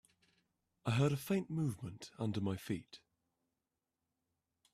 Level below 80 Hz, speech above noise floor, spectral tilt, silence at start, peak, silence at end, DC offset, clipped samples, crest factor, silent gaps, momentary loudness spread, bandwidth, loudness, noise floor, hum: -72 dBFS; 52 dB; -6.5 dB/octave; 0.85 s; -22 dBFS; 1.75 s; under 0.1%; under 0.1%; 18 dB; none; 14 LU; 15.5 kHz; -39 LUFS; -90 dBFS; none